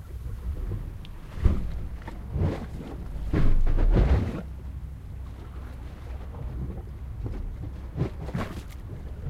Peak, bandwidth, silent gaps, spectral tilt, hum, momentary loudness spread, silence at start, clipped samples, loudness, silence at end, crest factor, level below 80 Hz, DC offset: -8 dBFS; 6.4 kHz; none; -8.5 dB/octave; none; 14 LU; 0 s; under 0.1%; -32 LUFS; 0 s; 20 dB; -28 dBFS; under 0.1%